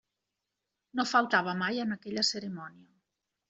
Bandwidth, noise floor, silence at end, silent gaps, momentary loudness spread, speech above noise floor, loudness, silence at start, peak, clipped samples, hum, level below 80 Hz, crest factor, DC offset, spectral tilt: 8.2 kHz; -86 dBFS; 0.8 s; none; 15 LU; 56 dB; -30 LUFS; 0.95 s; -12 dBFS; under 0.1%; none; -76 dBFS; 22 dB; under 0.1%; -3.5 dB/octave